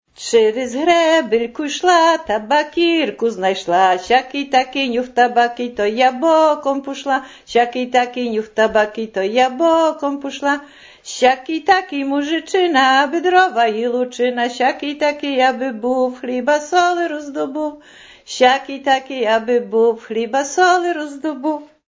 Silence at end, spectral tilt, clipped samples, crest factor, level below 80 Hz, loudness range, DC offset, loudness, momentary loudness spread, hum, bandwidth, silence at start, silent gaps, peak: 0.25 s; -3 dB/octave; under 0.1%; 16 dB; -58 dBFS; 3 LU; under 0.1%; -17 LUFS; 9 LU; none; 8 kHz; 0.2 s; none; -2 dBFS